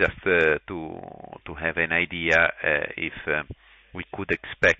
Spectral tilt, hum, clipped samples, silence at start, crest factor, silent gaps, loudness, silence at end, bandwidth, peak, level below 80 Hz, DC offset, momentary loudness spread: -5 dB/octave; none; under 0.1%; 0 s; 18 dB; none; -24 LUFS; 0.05 s; 8 kHz; -6 dBFS; -48 dBFS; under 0.1%; 20 LU